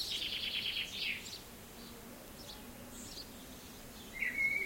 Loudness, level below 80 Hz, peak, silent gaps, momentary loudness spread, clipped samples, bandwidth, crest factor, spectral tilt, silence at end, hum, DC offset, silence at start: -39 LUFS; -60 dBFS; -24 dBFS; none; 15 LU; under 0.1%; 16.5 kHz; 18 dB; -1.5 dB/octave; 0 s; none; under 0.1%; 0 s